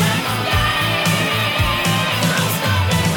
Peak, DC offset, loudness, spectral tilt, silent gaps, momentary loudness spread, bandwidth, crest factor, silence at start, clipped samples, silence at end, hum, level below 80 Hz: -4 dBFS; under 0.1%; -17 LUFS; -4 dB/octave; none; 1 LU; 20 kHz; 14 dB; 0 s; under 0.1%; 0 s; none; -34 dBFS